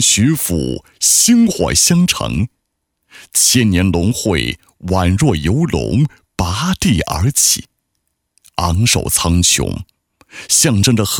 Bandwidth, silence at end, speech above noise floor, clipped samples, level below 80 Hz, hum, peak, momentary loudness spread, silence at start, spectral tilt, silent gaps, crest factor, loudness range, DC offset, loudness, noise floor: over 20 kHz; 0 s; 57 dB; under 0.1%; -32 dBFS; none; 0 dBFS; 11 LU; 0 s; -3.5 dB/octave; none; 14 dB; 3 LU; under 0.1%; -13 LUFS; -71 dBFS